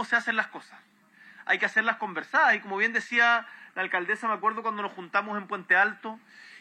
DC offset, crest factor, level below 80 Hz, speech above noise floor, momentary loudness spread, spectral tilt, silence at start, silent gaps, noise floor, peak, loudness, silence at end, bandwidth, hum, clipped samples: under 0.1%; 18 dB; under -90 dBFS; 25 dB; 15 LU; -3.5 dB/octave; 0 s; none; -53 dBFS; -10 dBFS; -26 LUFS; 0 s; 11 kHz; none; under 0.1%